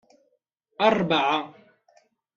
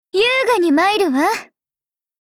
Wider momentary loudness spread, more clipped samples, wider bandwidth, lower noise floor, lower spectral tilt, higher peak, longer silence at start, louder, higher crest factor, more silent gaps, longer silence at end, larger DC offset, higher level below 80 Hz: first, 9 LU vs 5 LU; neither; second, 7.4 kHz vs 17 kHz; second, -72 dBFS vs under -90 dBFS; first, -5.5 dB/octave vs -2.5 dB/octave; about the same, -4 dBFS vs -6 dBFS; first, 0.8 s vs 0.15 s; second, -23 LUFS vs -16 LUFS; first, 22 dB vs 12 dB; neither; about the same, 0.85 s vs 0.8 s; neither; second, -68 dBFS vs -58 dBFS